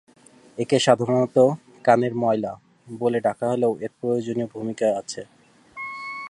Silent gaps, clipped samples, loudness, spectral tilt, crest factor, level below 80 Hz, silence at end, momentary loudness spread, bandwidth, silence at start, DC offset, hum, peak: none; under 0.1%; -23 LUFS; -5.5 dB/octave; 22 dB; -66 dBFS; 0 s; 16 LU; 11.5 kHz; 0.55 s; under 0.1%; none; -2 dBFS